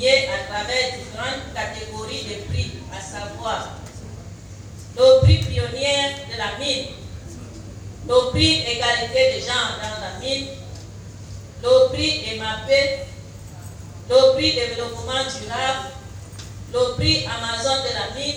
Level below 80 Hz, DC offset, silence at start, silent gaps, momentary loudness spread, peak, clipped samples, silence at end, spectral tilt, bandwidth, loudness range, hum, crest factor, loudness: -38 dBFS; under 0.1%; 0 s; none; 21 LU; -2 dBFS; under 0.1%; 0 s; -4 dB/octave; 11.5 kHz; 7 LU; none; 20 dB; -20 LUFS